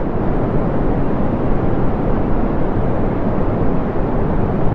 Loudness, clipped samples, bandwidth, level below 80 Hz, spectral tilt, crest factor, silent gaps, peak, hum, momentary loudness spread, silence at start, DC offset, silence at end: -19 LUFS; under 0.1%; 4.1 kHz; -22 dBFS; -11 dB/octave; 12 dB; none; -2 dBFS; none; 1 LU; 0 s; under 0.1%; 0 s